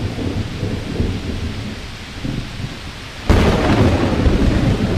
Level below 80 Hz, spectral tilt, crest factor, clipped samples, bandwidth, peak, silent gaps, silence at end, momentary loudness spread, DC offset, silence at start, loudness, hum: -24 dBFS; -6.5 dB/octave; 14 dB; under 0.1%; 14 kHz; -2 dBFS; none; 0 s; 14 LU; under 0.1%; 0 s; -19 LUFS; none